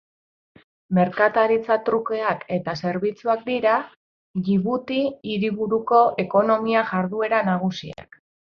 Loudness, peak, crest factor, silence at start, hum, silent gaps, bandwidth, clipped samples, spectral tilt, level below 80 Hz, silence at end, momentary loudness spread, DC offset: -22 LUFS; -2 dBFS; 20 dB; 0.9 s; none; 3.96-4.34 s; 6.6 kHz; under 0.1%; -7.5 dB/octave; -62 dBFS; 0.5 s; 8 LU; under 0.1%